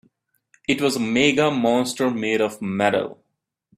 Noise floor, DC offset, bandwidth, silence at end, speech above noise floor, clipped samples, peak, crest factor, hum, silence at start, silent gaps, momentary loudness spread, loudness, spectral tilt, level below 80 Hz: -77 dBFS; under 0.1%; 15 kHz; 0.65 s; 56 dB; under 0.1%; -2 dBFS; 20 dB; none; 0.7 s; none; 7 LU; -21 LUFS; -4.5 dB/octave; -60 dBFS